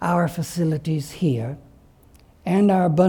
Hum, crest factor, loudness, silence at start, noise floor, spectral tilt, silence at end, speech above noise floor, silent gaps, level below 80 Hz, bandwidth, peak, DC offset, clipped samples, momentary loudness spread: none; 16 dB; -22 LUFS; 0 s; -52 dBFS; -7.5 dB/octave; 0 s; 32 dB; none; -52 dBFS; 19 kHz; -6 dBFS; under 0.1%; under 0.1%; 14 LU